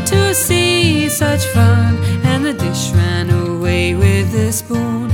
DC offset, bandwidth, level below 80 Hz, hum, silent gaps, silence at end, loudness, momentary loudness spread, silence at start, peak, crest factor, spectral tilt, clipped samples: under 0.1%; 17.5 kHz; -34 dBFS; none; none; 0 s; -14 LUFS; 5 LU; 0 s; 0 dBFS; 12 dB; -5 dB/octave; under 0.1%